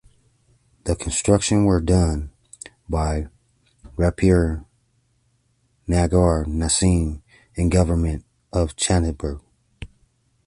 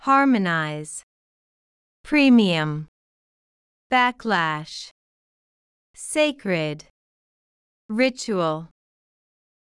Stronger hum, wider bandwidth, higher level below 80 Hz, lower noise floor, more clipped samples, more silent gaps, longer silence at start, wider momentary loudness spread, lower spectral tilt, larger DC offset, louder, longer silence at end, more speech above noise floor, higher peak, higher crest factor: neither; about the same, 11.5 kHz vs 12 kHz; first, -30 dBFS vs -62 dBFS; second, -65 dBFS vs under -90 dBFS; neither; second, none vs 1.03-2.04 s, 2.88-3.90 s, 4.91-5.94 s, 6.90-7.89 s; first, 0.85 s vs 0.05 s; about the same, 20 LU vs 19 LU; about the same, -5.5 dB/octave vs -5 dB/octave; neither; about the same, -21 LUFS vs -21 LUFS; second, 0.6 s vs 1.05 s; second, 46 dB vs over 69 dB; first, -2 dBFS vs -6 dBFS; about the same, 20 dB vs 18 dB